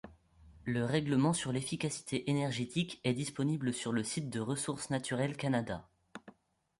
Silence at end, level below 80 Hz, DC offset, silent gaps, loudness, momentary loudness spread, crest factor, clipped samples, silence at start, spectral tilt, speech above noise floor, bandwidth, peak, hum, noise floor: 0.5 s; -66 dBFS; under 0.1%; none; -35 LUFS; 12 LU; 18 dB; under 0.1%; 0.05 s; -5 dB/octave; 26 dB; 11.5 kHz; -18 dBFS; none; -61 dBFS